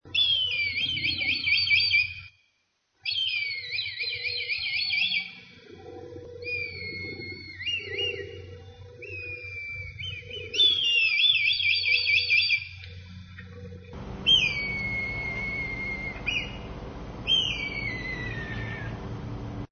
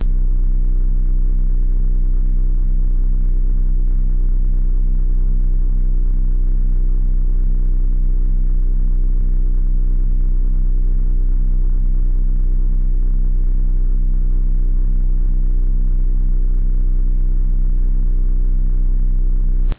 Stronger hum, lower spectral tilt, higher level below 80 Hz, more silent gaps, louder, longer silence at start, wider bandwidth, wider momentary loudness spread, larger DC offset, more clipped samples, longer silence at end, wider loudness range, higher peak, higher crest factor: neither; second, -3 dB/octave vs -12 dB/octave; second, -50 dBFS vs -14 dBFS; neither; second, -25 LUFS vs -21 LUFS; about the same, 0.05 s vs 0 s; first, 6.8 kHz vs 0.6 kHz; first, 22 LU vs 0 LU; second, under 0.1% vs 2%; neither; about the same, 0.05 s vs 0 s; first, 11 LU vs 0 LU; about the same, -10 dBFS vs -10 dBFS; first, 18 dB vs 4 dB